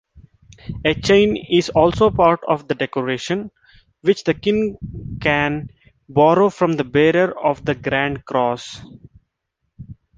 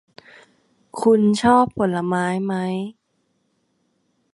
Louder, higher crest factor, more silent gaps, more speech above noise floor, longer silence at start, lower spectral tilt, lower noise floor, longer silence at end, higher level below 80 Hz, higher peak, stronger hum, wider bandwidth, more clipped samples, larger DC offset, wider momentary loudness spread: about the same, -18 LUFS vs -19 LUFS; about the same, 18 dB vs 20 dB; neither; first, 57 dB vs 50 dB; second, 0.15 s vs 0.95 s; about the same, -6 dB/octave vs -6.5 dB/octave; first, -74 dBFS vs -69 dBFS; second, 0.25 s vs 1.45 s; first, -44 dBFS vs -56 dBFS; about the same, -2 dBFS vs -2 dBFS; neither; second, 9.2 kHz vs 11.5 kHz; neither; neither; about the same, 14 LU vs 12 LU